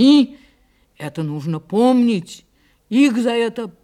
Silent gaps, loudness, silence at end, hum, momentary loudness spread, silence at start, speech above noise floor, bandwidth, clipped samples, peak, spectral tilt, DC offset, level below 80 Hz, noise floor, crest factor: none; -18 LUFS; 0.15 s; none; 14 LU; 0 s; 41 dB; 12 kHz; under 0.1%; -4 dBFS; -6 dB/octave; under 0.1%; -62 dBFS; -57 dBFS; 14 dB